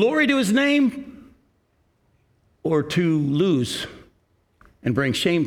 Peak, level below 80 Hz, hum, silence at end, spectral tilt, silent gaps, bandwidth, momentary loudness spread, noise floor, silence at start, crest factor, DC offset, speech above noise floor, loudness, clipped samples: -6 dBFS; -58 dBFS; none; 0 s; -5.5 dB/octave; none; 16 kHz; 13 LU; -65 dBFS; 0 s; 16 dB; under 0.1%; 45 dB; -21 LUFS; under 0.1%